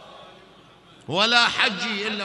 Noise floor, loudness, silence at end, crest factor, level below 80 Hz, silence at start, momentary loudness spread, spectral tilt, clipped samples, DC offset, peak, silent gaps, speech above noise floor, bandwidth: -51 dBFS; -20 LUFS; 0 s; 24 dB; -66 dBFS; 0 s; 9 LU; -2.5 dB/octave; under 0.1%; under 0.1%; 0 dBFS; none; 29 dB; 11.5 kHz